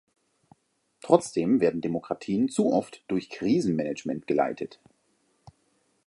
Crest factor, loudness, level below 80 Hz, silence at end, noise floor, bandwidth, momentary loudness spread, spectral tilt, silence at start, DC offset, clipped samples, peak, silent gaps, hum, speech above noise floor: 24 dB; -27 LUFS; -66 dBFS; 1.4 s; -70 dBFS; 11.5 kHz; 9 LU; -6.5 dB/octave; 1.05 s; under 0.1%; under 0.1%; -4 dBFS; none; none; 44 dB